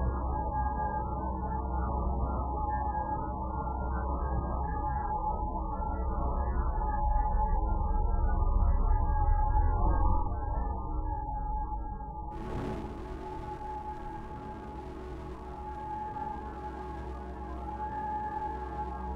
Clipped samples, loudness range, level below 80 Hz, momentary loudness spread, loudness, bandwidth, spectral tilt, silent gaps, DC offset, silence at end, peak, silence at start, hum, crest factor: under 0.1%; 9 LU; -32 dBFS; 11 LU; -34 LUFS; 3.9 kHz; -9.5 dB/octave; none; under 0.1%; 0 s; -14 dBFS; 0 s; none; 16 dB